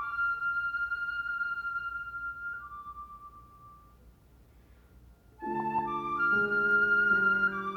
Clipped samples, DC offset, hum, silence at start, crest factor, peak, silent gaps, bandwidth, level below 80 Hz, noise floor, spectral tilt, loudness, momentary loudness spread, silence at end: under 0.1%; under 0.1%; none; 0 s; 16 dB; -16 dBFS; none; 6.2 kHz; -60 dBFS; -58 dBFS; -6 dB/octave; -29 LUFS; 19 LU; 0 s